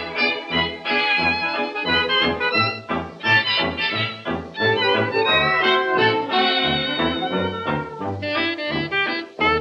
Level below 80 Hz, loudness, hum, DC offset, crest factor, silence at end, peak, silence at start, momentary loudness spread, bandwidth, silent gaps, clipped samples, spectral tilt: -48 dBFS; -20 LUFS; none; under 0.1%; 16 dB; 0 s; -6 dBFS; 0 s; 8 LU; 8.6 kHz; none; under 0.1%; -5.5 dB/octave